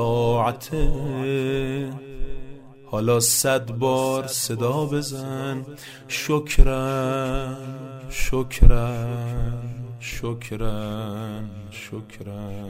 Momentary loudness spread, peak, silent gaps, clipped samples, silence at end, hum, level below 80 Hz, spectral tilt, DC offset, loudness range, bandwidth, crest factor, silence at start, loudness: 16 LU; 0 dBFS; none; under 0.1%; 0 s; none; -26 dBFS; -4.5 dB/octave; under 0.1%; 5 LU; 16 kHz; 22 dB; 0 s; -24 LUFS